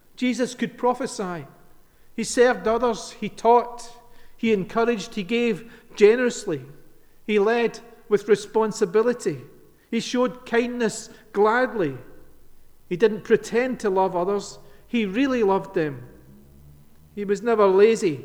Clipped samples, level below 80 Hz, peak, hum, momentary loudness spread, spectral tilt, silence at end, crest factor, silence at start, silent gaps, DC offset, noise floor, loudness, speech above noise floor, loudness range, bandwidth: under 0.1%; -54 dBFS; -4 dBFS; none; 14 LU; -5 dB/octave; 0 s; 20 dB; 0.2 s; none; under 0.1%; -50 dBFS; -23 LUFS; 28 dB; 2 LU; 13.5 kHz